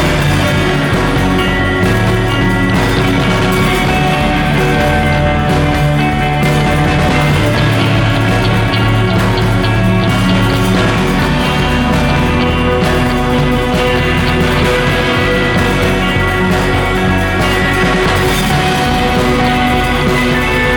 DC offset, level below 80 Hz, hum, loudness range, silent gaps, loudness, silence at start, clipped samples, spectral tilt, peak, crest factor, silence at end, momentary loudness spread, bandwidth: under 0.1%; -22 dBFS; none; 0 LU; none; -12 LUFS; 0 s; under 0.1%; -5.5 dB/octave; -2 dBFS; 10 dB; 0 s; 1 LU; over 20 kHz